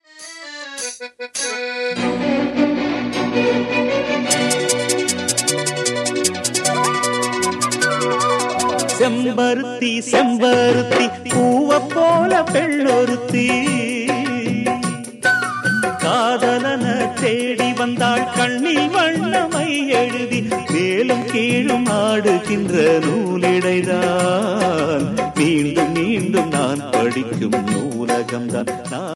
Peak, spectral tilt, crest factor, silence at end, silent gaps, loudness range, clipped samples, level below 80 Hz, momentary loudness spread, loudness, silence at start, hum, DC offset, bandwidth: -2 dBFS; -4 dB/octave; 16 dB; 0 s; none; 3 LU; under 0.1%; -56 dBFS; 6 LU; -18 LUFS; 0.15 s; none; under 0.1%; 15 kHz